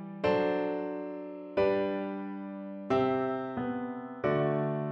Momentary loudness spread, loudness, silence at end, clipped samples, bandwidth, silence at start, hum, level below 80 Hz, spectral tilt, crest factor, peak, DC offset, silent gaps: 11 LU; -32 LUFS; 0 s; under 0.1%; 6.6 kHz; 0 s; none; -64 dBFS; -8.5 dB/octave; 16 dB; -16 dBFS; under 0.1%; none